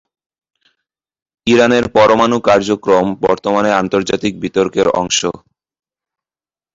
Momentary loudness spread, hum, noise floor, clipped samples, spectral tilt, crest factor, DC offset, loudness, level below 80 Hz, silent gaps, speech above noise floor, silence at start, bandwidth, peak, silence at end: 7 LU; none; under -90 dBFS; under 0.1%; -4 dB/octave; 14 dB; under 0.1%; -13 LUFS; -48 dBFS; none; over 77 dB; 1.45 s; 7.8 kHz; 0 dBFS; 1.4 s